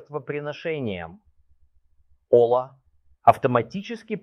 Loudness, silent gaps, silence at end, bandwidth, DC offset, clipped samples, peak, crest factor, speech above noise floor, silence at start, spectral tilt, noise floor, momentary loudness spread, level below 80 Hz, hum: -23 LUFS; none; 0 s; 12 kHz; under 0.1%; under 0.1%; -2 dBFS; 24 dB; 38 dB; 0.1 s; -7.5 dB/octave; -61 dBFS; 16 LU; -62 dBFS; none